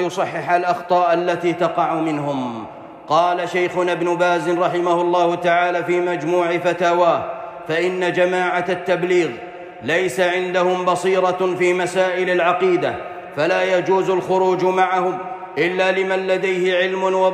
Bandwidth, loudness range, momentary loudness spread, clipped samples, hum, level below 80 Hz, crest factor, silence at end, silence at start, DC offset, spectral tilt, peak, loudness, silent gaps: 12 kHz; 2 LU; 7 LU; under 0.1%; none; -64 dBFS; 14 dB; 0 s; 0 s; under 0.1%; -5.5 dB/octave; -4 dBFS; -18 LUFS; none